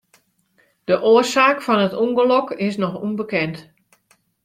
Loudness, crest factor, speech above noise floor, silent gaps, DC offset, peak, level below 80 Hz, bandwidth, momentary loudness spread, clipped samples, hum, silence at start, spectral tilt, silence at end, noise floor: -18 LUFS; 18 dB; 44 dB; none; under 0.1%; -2 dBFS; -64 dBFS; 15 kHz; 11 LU; under 0.1%; none; 0.9 s; -5 dB/octave; 0.85 s; -62 dBFS